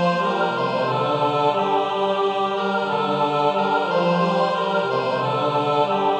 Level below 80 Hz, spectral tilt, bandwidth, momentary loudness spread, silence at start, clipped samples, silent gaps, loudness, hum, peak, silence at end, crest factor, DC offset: -68 dBFS; -6.5 dB/octave; 9.8 kHz; 2 LU; 0 s; under 0.1%; none; -21 LUFS; none; -8 dBFS; 0 s; 14 dB; under 0.1%